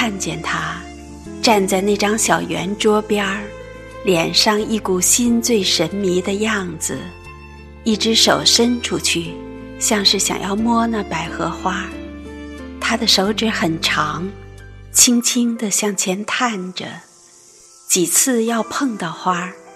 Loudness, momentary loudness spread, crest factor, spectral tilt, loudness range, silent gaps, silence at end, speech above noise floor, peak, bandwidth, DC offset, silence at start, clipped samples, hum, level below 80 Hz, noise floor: -17 LUFS; 19 LU; 18 dB; -2.5 dB/octave; 3 LU; none; 0 s; 29 dB; 0 dBFS; 14.5 kHz; under 0.1%; 0 s; under 0.1%; none; -44 dBFS; -46 dBFS